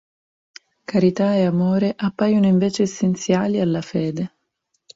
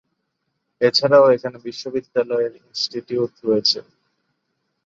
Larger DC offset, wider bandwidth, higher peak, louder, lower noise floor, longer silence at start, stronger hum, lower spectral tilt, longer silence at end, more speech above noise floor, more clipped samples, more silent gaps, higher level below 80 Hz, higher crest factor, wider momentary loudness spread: neither; about the same, 7.8 kHz vs 7.6 kHz; about the same, -4 dBFS vs -2 dBFS; about the same, -20 LUFS vs -19 LUFS; about the same, -72 dBFS vs -74 dBFS; about the same, 0.9 s vs 0.8 s; neither; first, -7 dB/octave vs -4.5 dB/octave; second, 0.7 s vs 1.05 s; about the same, 54 dB vs 56 dB; neither; neither; first, -58 dBFS vs -66 dBFS; about the same, 16 dB vs 18 dB; second, 7 LU vs 13 LU